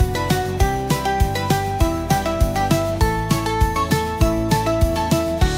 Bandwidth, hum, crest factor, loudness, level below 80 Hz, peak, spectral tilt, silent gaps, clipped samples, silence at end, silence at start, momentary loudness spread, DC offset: 16.5 kHz; none; 14 dB; -20 LUFS; -24 dBFS; -4 dBFS; -5.5 dB/octave; none; under 0.1%; 0 s; 0 s; 2 LU; under 0.1%